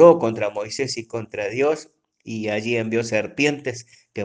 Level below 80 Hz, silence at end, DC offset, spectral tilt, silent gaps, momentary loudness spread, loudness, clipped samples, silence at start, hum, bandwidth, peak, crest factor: -66 dBFS; 0 s; under 0.1%; -5 dB/octave; none; 10 LU; -23 LUFS; under 0.1%; 0 s; none; 9.6 kHz; 0 dBFS; 20 dB